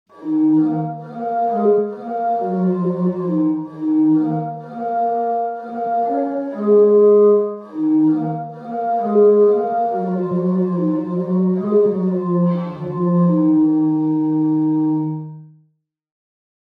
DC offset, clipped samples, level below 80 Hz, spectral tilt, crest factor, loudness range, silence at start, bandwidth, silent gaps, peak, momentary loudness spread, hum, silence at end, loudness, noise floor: under 0.1%; under 0.1%; -70 dBFS; -12 dB/octave; 14 dB; 4 LU; 0.2 s; 3.8 kHz; none; -4 dBFS; 11 LU; none; 1.15 s; -18 LUFS; -64 dBFS